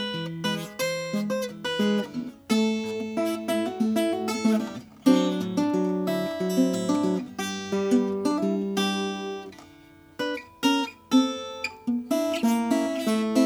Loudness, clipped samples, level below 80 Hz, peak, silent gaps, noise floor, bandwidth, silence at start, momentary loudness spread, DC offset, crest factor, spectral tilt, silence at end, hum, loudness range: -26 LUFS; under 0.1%; -68 dBFS; -8 dBFS; none; -51 dBFS; over 20 kHz; 0 s; 8 LU; under 0.1%; 18 dB; -5 dB/octave; 0 s; none; 3 LU